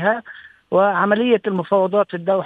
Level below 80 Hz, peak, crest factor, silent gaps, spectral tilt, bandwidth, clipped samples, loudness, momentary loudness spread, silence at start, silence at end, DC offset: -66 dBFS; -2 dBFS; 16 dB; none; -8.5 dB/octave; 4.6 kHz; under 0.1%; -18 LUFS; 5 LU; 0 s; 0 s; under 0.1%